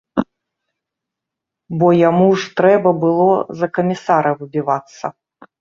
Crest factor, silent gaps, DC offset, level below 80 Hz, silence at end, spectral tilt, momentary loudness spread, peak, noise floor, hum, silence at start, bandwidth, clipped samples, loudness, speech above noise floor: 16 dB; none; under 0.1%; -58 dBFS; 0.5 s; -7.5 dB/octave; 15 LU; -2 dBFS; -83 dBFS; none; 0.15 s; 7.4 kHz; under 0.1%; -15 LUFS; 68 dB